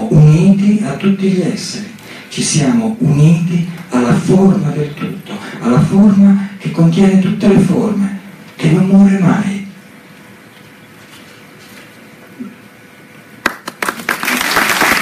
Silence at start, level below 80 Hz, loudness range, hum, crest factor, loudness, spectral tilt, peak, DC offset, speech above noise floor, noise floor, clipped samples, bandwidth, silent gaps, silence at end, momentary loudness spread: 0 s; -42 dBFS; 11 LU; none; 12 dB; -12 LUFS; -6 dB/octave; 0 dBFS; under 0.1%; 28 dB; -39 dBFS; under 0.1%; 15.5 kHz; none; 0 s; 17 LU